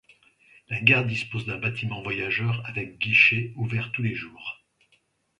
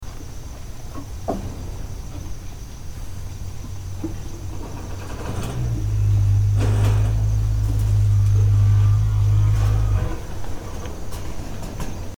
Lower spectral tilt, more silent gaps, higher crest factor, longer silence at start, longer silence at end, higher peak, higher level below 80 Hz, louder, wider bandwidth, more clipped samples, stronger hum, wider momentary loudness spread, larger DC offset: about the same, -6 dB/octave vs -7 dB/octave; neither; first, 26 dB vs 14 dB; first, 0.7 s vs 0 s; first, 0.85 s vs 0 s; first, -2 dBFS vs -8 dBFS; second, -60 dBFS vs -28 dBFS; about the same, -24 LUFS vs -22 LUFS; second, 10 kHz vs 14 kHz; neither; neither; about the same, 16 LU vs 18 LU; neither